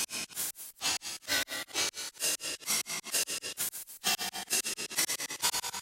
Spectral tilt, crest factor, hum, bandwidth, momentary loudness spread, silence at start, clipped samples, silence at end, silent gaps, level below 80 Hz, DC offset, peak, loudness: 1 dB/octave; 20 dB; none; 17 kHz; 4 LU; 0 s; under 0.1%; 0 s; none; -70 dBFS; under 0.1%; -14 dBFS; -32 LUFS